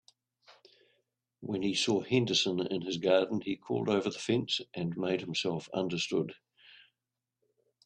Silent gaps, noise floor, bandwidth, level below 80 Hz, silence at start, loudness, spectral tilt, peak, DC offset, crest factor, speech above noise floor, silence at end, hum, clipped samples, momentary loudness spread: none; -89 dBFS; 10.5 kHz; -72 dBFS; 0.5 s; -32 LUFS; -4.5 dB/octave; -12 dBFS; under 0.1%; 22 dB; 58 dB; 1.5 s; none; under 0.1%; 7 LU